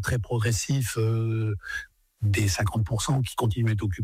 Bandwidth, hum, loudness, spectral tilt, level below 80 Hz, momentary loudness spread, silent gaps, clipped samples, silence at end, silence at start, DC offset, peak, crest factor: 16 kHz; none; -26 LUFS; -5 dB/octave; -44 dBFS; 6 LU; none; under 0.1%; 0 s; 0 s; under 0.1%; -16 dBFS; 10 dB